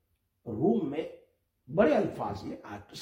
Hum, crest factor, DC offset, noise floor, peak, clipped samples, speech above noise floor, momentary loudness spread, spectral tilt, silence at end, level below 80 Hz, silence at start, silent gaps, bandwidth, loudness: none; 22 dB; under 0.1%; -66 dBFS; -10 dBFS; under 0.1%; 36 dB; 18 LU; -7.5 dB/octave; 0 s; -62 dBFS; 0.45 s; none; 14.5 kHz; -30 LUFS